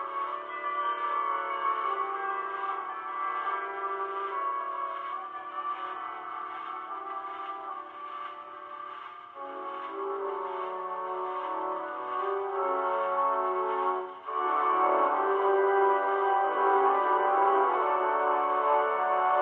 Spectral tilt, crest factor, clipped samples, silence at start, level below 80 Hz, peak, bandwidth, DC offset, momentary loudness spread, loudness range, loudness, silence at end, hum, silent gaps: -5.5 dB/octave; 18 dB; under 0.1%; 0 s; -88 dBFS; -12 dBFS; 4.2 kHz; under 0.1%; 13 LU; 12 LU; -29 LUFS; 0 s; none; none